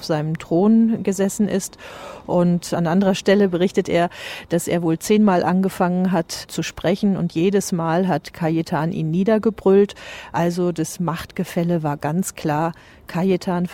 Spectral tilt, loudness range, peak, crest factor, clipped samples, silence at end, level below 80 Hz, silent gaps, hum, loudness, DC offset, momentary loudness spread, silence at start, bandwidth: -6 dB/octave; 3 LU; -4 dBFS; 14 dB; under 0.1%; 0 s; -52 dBFS; none; none; -20 LUFS; under 0.1%; 9 LU; 0 s; 16.5 kHz